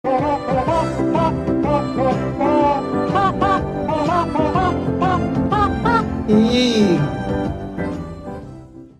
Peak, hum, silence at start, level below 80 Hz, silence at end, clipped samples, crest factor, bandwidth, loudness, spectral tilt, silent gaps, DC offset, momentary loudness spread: -2 dBFS; none; 0.05 s; -36 dBFS; 0.1 s; under 0.1%; 16 dB; 11.5 kHz; -18 LUFS; -7 dB/octave; none; under 0.1%; 10 LU